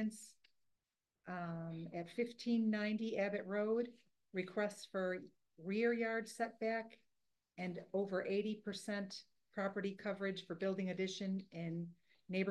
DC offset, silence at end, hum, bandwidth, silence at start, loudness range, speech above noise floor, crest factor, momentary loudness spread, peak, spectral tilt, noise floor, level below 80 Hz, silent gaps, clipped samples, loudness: under 0.1%; 0 s; none; 12 kHz; 0 s; 3 LU; over 49 dB; 18 dB; 12 LU; -24 dBFS; -6 dB/octave; under -90 dBFS; -86 dBFS; none; under 0.1%; -42 LUFS